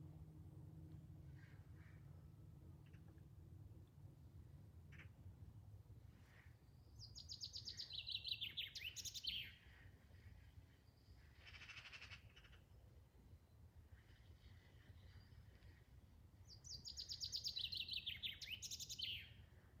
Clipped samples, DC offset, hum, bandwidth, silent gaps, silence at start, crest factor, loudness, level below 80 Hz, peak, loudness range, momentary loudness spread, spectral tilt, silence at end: under 0.1%; under 0.1%; none; 17 kHz; none; 0 s; 24 dB; -51 LUFS; -70 dBFS; -32 dBFS; 16 LU; 21 LU; -1.5 dB/octave; 0 s